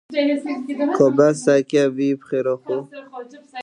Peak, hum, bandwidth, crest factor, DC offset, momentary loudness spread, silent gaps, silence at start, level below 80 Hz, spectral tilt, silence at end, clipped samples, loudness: -2 dBFS; none; 11 kHz; 18 dB; under 0.1%; 21 LU; none; 0.1 s; -74 dBFS; -6 dB/octave; 0 s; under 0.1%; -19 LUFS